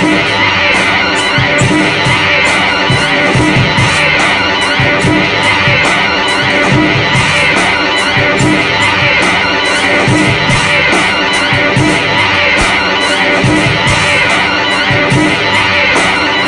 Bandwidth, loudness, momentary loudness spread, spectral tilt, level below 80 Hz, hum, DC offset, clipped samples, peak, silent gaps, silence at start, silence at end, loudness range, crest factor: 11.5 kHz; -8 LUFS; 2 LU; -4 dB/octave; -32 dBFS; none; under 0.1%; under 0.1%; 0 dBFS; none; 0 s; 0 s; 0 LU; 10 dB